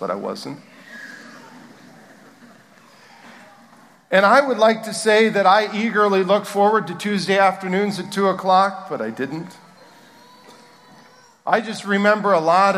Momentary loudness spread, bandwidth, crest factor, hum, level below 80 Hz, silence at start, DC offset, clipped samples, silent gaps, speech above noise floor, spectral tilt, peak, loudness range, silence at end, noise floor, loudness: 20 LU; 15 kHz; 20 dB; none; -76 dBFS; 0 s; under 0.1%; under 0.1%; none; 31 dB; -4.5 dB/octave; -2 dBFS; 10 LU; 0 s; -49 dBFS; -18 LUFS